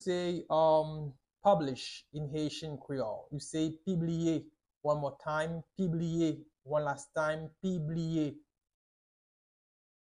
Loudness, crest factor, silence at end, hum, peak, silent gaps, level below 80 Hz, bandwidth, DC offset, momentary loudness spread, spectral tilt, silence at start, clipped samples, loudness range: -34 LUFS; 20 dB; 1.7 s; none; -14 dBFS; 4.76-4.81 s; -66 dBFS; 11 kHz; under 0.1%; 11 LU; -6.5 dB/octave; 0 s; under 0.1%; 4 LU